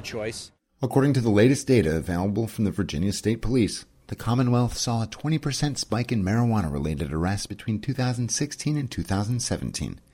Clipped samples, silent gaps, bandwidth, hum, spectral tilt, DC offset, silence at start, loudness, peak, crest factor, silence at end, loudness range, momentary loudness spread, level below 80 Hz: under 0.1%; none; 16.5 kHz; none; -5.5 dB/octave; under 0.1%; 0 s; -25 LUFS; -6 dBFS; 18 dB; 0.15 s; 3 LU; 10 LU; -42 dBFS